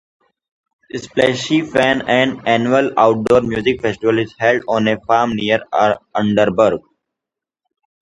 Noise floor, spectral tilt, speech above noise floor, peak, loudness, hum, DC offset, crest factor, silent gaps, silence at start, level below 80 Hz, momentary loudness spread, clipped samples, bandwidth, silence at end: -85 dBFS; -5.5 dB/octave; 70 dB; 0 dBFS; -16 LUFS; none; under 0.1%; 16 dB; none; 0.95 s; -50 dBFS; 4 LU; under 0.1%; 11 kHz; 1.2 s